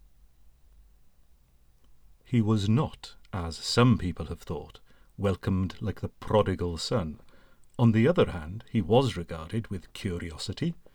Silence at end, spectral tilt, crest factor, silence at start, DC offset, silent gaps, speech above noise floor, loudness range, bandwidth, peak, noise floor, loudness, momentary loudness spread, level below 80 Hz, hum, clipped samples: 0.15 s; -6.5 dB/octave; 20 dB; 0.45 s; under 0.1%; none; 33 dB; 4 LU; 13 kHz; -8 dBFS; -60 dBFS; -28 LUFS; 16 LU; -48 dBFS; none; under 0.1%